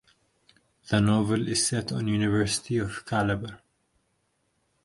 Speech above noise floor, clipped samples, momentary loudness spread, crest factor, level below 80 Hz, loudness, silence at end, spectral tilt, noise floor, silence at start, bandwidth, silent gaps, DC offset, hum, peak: 47 dB; under 0.1%; 6 LU; 20 dB; -52 dBFS; -26 LUFS; 1.3 s; -4.5 dB/octave; -73 dBFS; 0.85 s; 11.5 kHz; none; under 0.1%; none; -8 dBFS